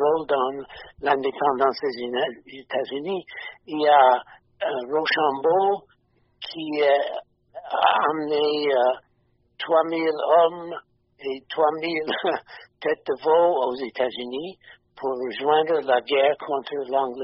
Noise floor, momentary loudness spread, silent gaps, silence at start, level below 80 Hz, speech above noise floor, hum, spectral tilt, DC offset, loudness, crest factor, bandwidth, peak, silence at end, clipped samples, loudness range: -66 dBFS; 14 LU; none; 0 s; -68 dBFS; 43 dB; none; -1 dB/octave; under 0.1%; -23 LUFS; 18 dB; 5.8 kHz; -4 dBFS; 0 s; under 0.1%; 3 LU